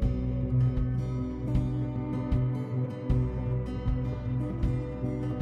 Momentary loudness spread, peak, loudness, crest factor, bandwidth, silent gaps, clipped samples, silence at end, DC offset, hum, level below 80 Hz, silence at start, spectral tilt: 5 LU; -14 dBFS; -31 LUFS; 14 dB; 5.4 kHz; none; under 0.1%; 0 s; under 0.1%; none; -36 dBFS; 0 s; -10 dB/octave